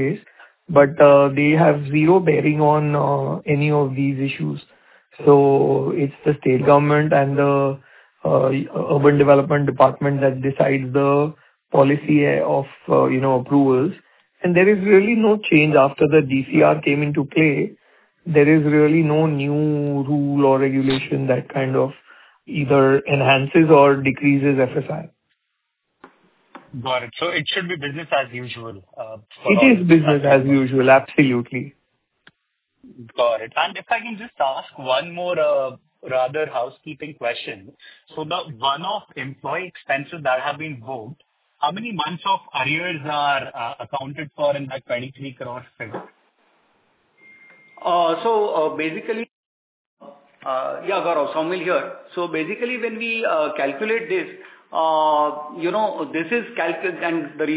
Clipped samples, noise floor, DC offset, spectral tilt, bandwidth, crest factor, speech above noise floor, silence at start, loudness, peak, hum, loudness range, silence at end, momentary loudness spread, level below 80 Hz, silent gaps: under 0.1%; -75 dBFS; under 0.1%; -11 dB/octave; 4 kHz; 18 dB; 57 dB; 0 s; -18 LUFS; 0 dBFS; none; 9 LU; 0 s; 15 LU; -60 dBFS; 49.31-49.97 s